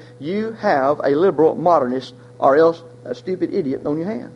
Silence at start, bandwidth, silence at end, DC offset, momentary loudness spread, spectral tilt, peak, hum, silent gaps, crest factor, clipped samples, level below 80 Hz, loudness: 0 s; 8.2 kHz; 0 s; under 0.1%; 13 LU; -7.5 dB/octave; -2 dBFS; none; none; 16 dB; under 0.1%; -60 dBFS; -18 LUFS